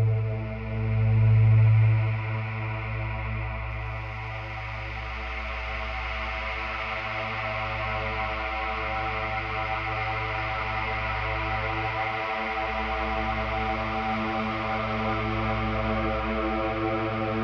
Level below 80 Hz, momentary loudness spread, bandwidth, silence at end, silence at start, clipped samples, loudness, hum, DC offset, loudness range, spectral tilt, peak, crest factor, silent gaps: -38 dBFS; 10 LU; 6 kHz; 0 s; 0 s; under 0.1%; -28 LUFS; none; under 0.1%; 8 LU; -8 dB/octave; -12 dBFS; 14 dB; none